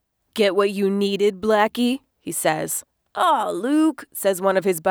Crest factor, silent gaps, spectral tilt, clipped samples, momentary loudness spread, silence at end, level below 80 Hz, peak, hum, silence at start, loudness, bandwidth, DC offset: 16 dB; none; -4 dB/octave; under 0.1%; 8 LU; 0 s; -64 dBFS; -4 dBFS; none; 0.35 s; -21 LUFS; over 20 kHz; under 0.1%